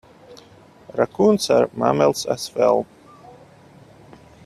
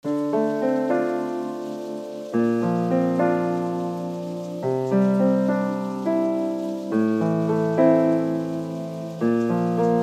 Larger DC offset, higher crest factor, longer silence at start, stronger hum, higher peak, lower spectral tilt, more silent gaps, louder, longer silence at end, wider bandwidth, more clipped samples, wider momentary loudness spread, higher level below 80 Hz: neither; about the same, 20 dB vs 16 dB; first, 0.3 s vs 0.05 s; neither; first, -2 dBFS vs -6 dBFS; second, -5 dB/octave vs -8.5 dB/octave; neither; first, -19 LUFS vs -23 LUFS; first, 1.6 s vs 0 s; about the same, 14.5 kHz vs 13.5 kHz; neither; second, 8 LU vs 11 LU; first, -60 dBFS vs -70 dBFS